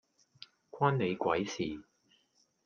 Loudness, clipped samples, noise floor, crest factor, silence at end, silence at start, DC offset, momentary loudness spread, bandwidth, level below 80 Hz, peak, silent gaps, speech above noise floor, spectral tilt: -33 LUFS; under 0.1%; -73 dBFS; 22 dB; 0.85 s; 0.75 s; under 0.1%; 24 LU; 7.2 kHz; -70 dBFS; -14 dBFS; none; 41 dB; -6 dB/octave